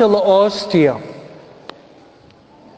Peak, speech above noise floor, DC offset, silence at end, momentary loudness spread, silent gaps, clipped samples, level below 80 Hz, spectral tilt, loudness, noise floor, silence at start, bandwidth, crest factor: 0 dBFS; 33 dB; under 0.1%; 1.45 s; 26 LU; none; under 0.1%; -58 dBFS; -6.5 dB/octave; -15 LUFS; -46 dBFS; 0 s; 8 kHz; 18 dB